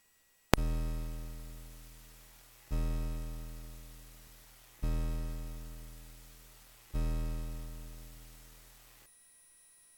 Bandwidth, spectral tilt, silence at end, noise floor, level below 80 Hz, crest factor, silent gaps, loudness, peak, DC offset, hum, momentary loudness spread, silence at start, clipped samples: 19 kHz; -5.5 dB/octave; 0.9 s; -69 dBFS; -40 dBFS; 38 dB; none; -40 LUFS; 0 dBFS; under 0.1%; none; 20 LU; 0.55 s; under 0.1%